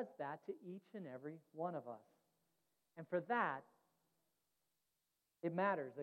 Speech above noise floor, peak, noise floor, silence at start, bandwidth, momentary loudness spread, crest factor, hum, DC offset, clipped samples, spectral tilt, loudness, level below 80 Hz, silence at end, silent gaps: 44 dB; -26 dBFS; -88 dBFS; 0 s; 16 kHz; 15 LU; 22 dB; none; under 0.1%; under 0.1%; -8 dB/octave; -45 LUFS; under -90 dBFS; 0 s; none